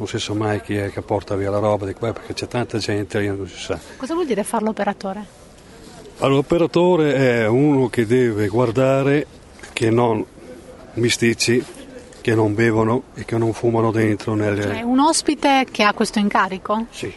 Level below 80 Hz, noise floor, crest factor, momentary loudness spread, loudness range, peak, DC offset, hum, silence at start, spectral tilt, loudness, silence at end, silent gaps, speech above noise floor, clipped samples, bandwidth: -48 dBFS; -42 dBFS; 18 dB; 12 LU; 6 LU; 0 dBFS; under 0.1%; none; 0 s; -5.5 dB/octave; -19 LUFS; 0 s; none; 23 dB; under 0.1%; 11.5 kHz